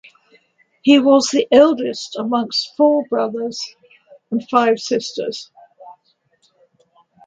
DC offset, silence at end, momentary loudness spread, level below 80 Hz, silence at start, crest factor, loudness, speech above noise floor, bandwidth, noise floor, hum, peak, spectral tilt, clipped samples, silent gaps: under 0.1%; 1.35 s; 14 LU; -66 dBFS; 0.85 s; 18 dB; -17 LUFS; 46 dB; 9.2 kHz; -62 dBFS; none; 0 dBFS; -3.5 dB/octave; under 0.1%; none